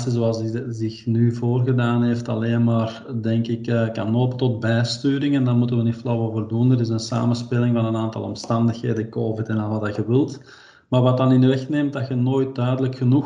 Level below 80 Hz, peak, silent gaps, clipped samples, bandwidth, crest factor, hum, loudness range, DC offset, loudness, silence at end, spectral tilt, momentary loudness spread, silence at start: -62 dBFS; -6 dBFS; none; under 0.1%; 9.2 kHz; 14 dB; none; 2 LU; under 0.1%; -21 LUFS; 0 s; -8 dB/octave; 6 LU; 0 s